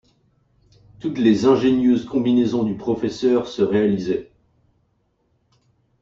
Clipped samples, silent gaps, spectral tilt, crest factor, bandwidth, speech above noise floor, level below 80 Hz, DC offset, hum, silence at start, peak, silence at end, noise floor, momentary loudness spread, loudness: under 0.1%; none; -7 dB/octave; 18 dB; 7.4 kHz; 48 dB; -54 dBFS; under 0.1%; none; 1.05 s; -4 dBFS; 1.75 s; -66 dBFS; 9 LU; -19 LUFS